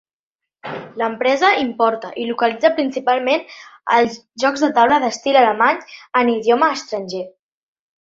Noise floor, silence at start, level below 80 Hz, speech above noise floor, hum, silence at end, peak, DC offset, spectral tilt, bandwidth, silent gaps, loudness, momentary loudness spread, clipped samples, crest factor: -85 dBFS; 0.65 s; -64 dBFS; 68 dB; none; 0.8 s; 0 dBFS; under 0.1%; -3.5 dB/octave; 7.8 kHz; none; -17 LUFS; 15 LU; under 0.1%; 18 dB